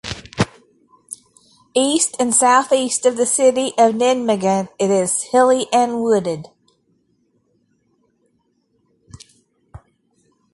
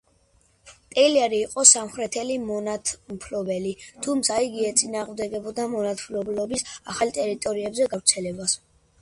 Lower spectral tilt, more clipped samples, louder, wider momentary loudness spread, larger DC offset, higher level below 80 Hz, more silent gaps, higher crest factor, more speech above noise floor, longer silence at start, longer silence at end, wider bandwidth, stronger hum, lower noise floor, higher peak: first, -3.5 dB/octave vs -2 dB/octave; neither; first, -16 LUFS vs -23 LUFS; about the same, 12 LU vs 11 LU; neither; first, -52 dBFS vs -60 dBFS; neither; second, 18 dB vs 24 dB; first, 49 dB vs 38 dB; second, 0.05 s vs 0.65 s; first, 0.75 s vs 0.45 s; about the same, 11.5 kHz vs 11.5 kHz; neither; about the same, -65 dBFS vs -62 dBFS; about the same, -2 dBFS vs 0 dBFS